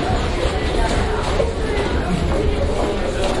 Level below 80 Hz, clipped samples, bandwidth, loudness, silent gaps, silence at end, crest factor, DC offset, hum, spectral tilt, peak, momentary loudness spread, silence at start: -24 dBFS; under 0.1%; 11.5 kHz; -20 LUFS; none; 0 s; 14 dB; under 0.1%; none; -5.5 dB/octave; -6 dBFS; 1 LU; 0 s